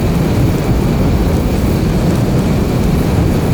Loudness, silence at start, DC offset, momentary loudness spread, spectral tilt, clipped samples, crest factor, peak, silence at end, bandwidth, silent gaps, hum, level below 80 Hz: -14 LUFS; 0 s; under 0.1%; 1 LU; -7.5 dB/octave; under 0.1%; 10 dB; -2 dBFS; 0 s; over 20 kHz; none; none; -20 dBFS